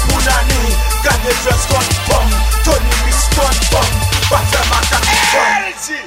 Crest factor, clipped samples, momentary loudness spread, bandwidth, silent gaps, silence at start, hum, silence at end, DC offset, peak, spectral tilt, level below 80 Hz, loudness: 12 dB; under 0.1%; 4 LU; 16.5 kHz; none; 0 s; none; 0 s; under 0.1%; 0 dBFS; -3 dB/octave; -16 dBFS; -13 LUFS